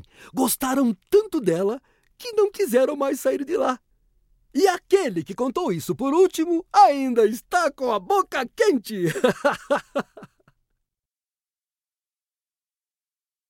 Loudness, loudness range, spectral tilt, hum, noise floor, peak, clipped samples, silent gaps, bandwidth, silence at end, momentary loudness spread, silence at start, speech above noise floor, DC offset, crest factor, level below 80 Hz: -22 LUFS; 7 LU; -4.5 dB/octave; none; under -90 dBFS; -4 dBFS; under 0.1%; none; 17 kHz; 3.25 s; 8 LU; 0.25 s; over 69 dB; under 0.1%; 18 dB; -62 dBFS